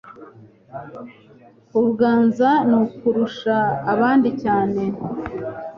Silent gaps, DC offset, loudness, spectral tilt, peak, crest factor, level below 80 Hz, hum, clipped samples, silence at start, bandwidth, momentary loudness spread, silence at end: none; under 0.1%; -19 LUFS; -8 dB/octave; -6 dBFS; 16 dB; -54 dBFS; none; under 0.1%; 0.05 s; 6.6 kHz; 19 LU; 0 s